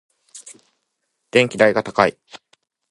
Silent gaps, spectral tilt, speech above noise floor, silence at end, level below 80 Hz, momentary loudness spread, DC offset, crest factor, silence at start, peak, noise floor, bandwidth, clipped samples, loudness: none; -4.5 dB/octave; 57 dB; 0.8 s; -60 dBFS; 24 LU; under 0.1%; 22 dB; 0.35 s; 0 dBFS; -74 dBFS; 11.5 kHz; under 0.1%; -17 LUFS